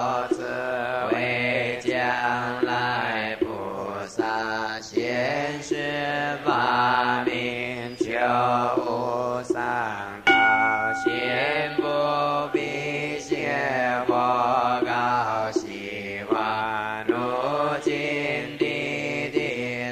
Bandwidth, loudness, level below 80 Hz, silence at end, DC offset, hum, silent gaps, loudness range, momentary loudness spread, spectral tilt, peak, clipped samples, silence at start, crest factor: 15 kHz; -24 LUFS; -60 dBFS; 0 s; under 0.1%; none; none; 4 LU; 7 LU; -5 dB/octave; -6 dBFS; under 0.1%; 0 s; 18 dB